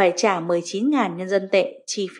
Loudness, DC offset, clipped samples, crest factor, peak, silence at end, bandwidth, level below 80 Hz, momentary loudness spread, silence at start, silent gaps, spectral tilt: -22 LUFS; under 0.1%; under 0.1%; 16 dB; -6 dBFS; 0 s; 11 kHz; -82 dBFS; 5 LU; 0 s; none; -4 dB/octave